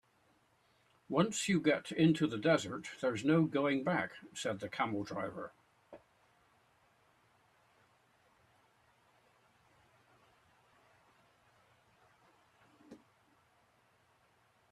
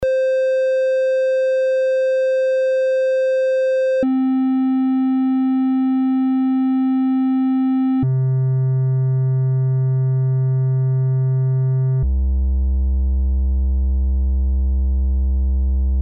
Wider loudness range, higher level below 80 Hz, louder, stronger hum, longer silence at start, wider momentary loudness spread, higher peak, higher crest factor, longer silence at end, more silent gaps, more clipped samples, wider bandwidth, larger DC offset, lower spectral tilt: first, 14 LU vs 2 LU; second, -76 dBFS vs -22 dBFS; second, -34 LUFS vs -18 LUFS; neither; first, 1.1 s vs 0 s; first, 11 LU vs 3 LU; second, -16 dBFS vs -8 dBFS; first, 22 dB vs 10 dB; first, 1.75 s vs 0 s; neither; neither; first, 13 kHz vs 6 kHz; neither; second, -5.5 dB/octave vs -9.5 dB/octave